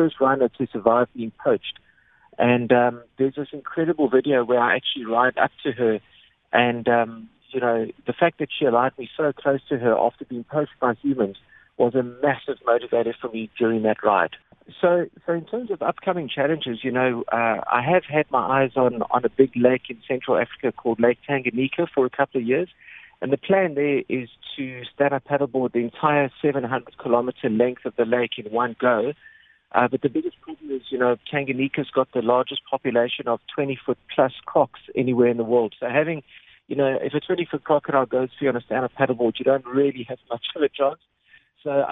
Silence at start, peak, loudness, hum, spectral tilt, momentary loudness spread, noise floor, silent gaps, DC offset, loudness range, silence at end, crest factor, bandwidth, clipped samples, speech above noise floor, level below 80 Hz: 0 s; -2 dBFS; -23 LUFS; none; -9.5 dB/octave; 8 LU; -57 dBFS; none; under 0.1%; 3 LU; 0 s; 22 dB; 4 kHz; under 0.1%; 34 dB; -66 dBFS